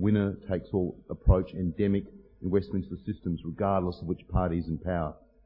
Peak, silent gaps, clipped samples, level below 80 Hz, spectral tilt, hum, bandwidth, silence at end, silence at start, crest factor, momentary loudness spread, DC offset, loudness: -8 dBFS; none; under 0.1%; -38 dBFS; -12 dB/octave; none; 5.4 kHz; 0.35 s; 0 s; 20 dB; 9 LU; under 0.1%; -30 LUFS